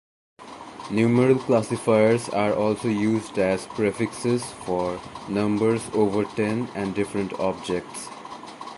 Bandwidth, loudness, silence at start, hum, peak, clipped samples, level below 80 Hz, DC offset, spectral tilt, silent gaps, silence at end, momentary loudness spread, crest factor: 11.5 kHz; -24 LUFS; 0.4 s; none; -6 dBFS; under 0.1%; -56 dBFS; under 0.1%; -6 dB/octave; none; 0 s; 16 LU; 18 dB